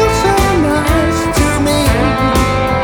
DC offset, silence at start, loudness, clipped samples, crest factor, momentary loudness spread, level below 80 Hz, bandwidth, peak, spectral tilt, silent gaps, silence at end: under 0.1%; 0 s; -12 LUFS; under 0.1%; 12 dB; 2 LU; -20 dBFS; over 20 kHz; 0 dBFS; -5 dB/octave; none; 0 s